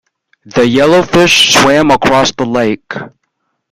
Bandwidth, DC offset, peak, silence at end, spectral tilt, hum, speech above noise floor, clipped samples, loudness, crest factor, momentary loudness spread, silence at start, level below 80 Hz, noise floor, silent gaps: 17 kHz; under 0.1%; 0 dBFS; 0.65 s; -3.5 dB/octave; none; 57 dB; 0.1%; -8 LUFS; 10 dB; 13 LU; 0.55 s; -40 dBFS; -66 dBFS; none